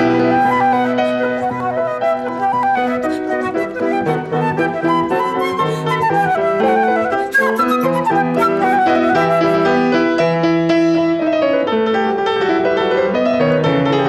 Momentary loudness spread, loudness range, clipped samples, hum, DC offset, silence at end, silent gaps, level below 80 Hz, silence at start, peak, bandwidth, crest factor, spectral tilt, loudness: 5 LU; 4 LU; under 0.1%; none; under 0.1%; 0 s; none; -52 dBFS; 0 s; -4 dBFS; 13 kHz; 12 dB; -6.5 dB/octave; -15 LUFS